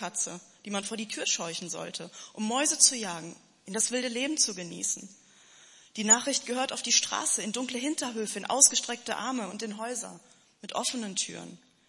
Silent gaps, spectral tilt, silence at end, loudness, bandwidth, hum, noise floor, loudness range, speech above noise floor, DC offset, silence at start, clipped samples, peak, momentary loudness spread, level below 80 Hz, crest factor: none; -1 dB/octave; 0.3 s; -27 LUFS; 11.5 kHz; none; -57 dBFS; 3 LU; 26 dB; under 0.1%; 0 s; under 0.1%; -4 dBFS; 17 LU; -82 dBFS; 26 dB